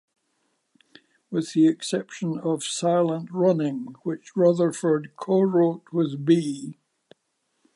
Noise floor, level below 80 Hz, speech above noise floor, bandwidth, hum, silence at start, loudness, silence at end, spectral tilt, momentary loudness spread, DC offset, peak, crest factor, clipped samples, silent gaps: -74 dBFS; -78 dBFS; 51 dB; 11.5 kHz; none; 1.3 s; -24 LUFS; 1.05 s; -6 dB/octave; 10 LU; under 0.1%; -8 dBFS; 18 dB; under 0.1%; none